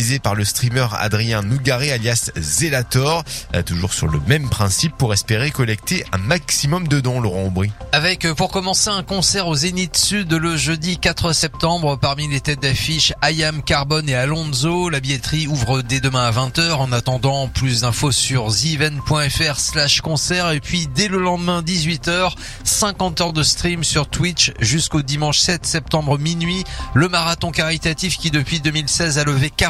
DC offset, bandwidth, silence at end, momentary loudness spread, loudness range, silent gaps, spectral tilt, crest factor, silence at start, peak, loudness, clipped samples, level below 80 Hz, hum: under 0.1%; 15.5 kHz; 0 s; 4 LU; 2 LU; none; -3.5 dB/octave; 18 dB; 0 s; 0 dBFS; -17 LUFS; under 0.1%; -36 dBFS; none